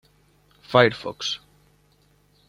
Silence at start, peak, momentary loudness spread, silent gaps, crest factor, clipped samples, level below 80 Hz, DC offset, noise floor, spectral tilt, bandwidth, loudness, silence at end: 0.7 s; -2 dBFS; 11 LU; none; 24 dB; under 0.1%; -62 dBFS; under 0.1%; -61 dBFS; -4.5 dB/octave; 14.5 kHz; -22 LUFS; 1.15 s